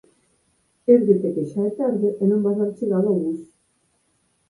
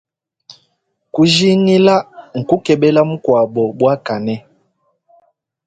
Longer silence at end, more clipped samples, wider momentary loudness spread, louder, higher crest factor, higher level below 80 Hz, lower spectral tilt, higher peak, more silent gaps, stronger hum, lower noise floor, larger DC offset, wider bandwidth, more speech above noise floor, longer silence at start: second, 1.05 s vs 1.3 s; neither; second, 9 LU vs 13 LU; second, -21 LUFS vs -14 LUFS; about the same, 18 dB vs 16 dB; second, -68 dBFS vs -56 dBFS; first, -11 dB/octave vs -6 dB/octave; second, -4 dBFS vs 0 dBFS; neither; neither; about the same, -67 dBFS vs -66 dBFS; neither; first, 11 kHz vs 9.2 kHz; second, 47 dB vs 53 dB; first, 0.9 s vs 0.5 s